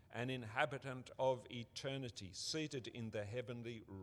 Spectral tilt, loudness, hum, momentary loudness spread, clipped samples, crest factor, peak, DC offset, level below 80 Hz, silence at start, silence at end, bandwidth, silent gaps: -4.5 dB/octave; -44 LUFS; none; 9 LU; under 0.1%; 24 dB; -20 dBFS; under 0.1%; -76 dBFS; 0 s; 0 s; 13 kHz; none